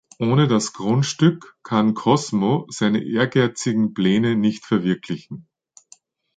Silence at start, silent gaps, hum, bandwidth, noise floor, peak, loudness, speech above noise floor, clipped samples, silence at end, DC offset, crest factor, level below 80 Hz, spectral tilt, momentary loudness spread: 0.2 s; none; none; 9.2 kHz; -53 dBFS; -4 dBFS; -20 LUFS; 34 dB; under 0.1%; 0.95 s; under 0.1%; 18 dB; -60 dBFS; -6 dB/octave; 8 LU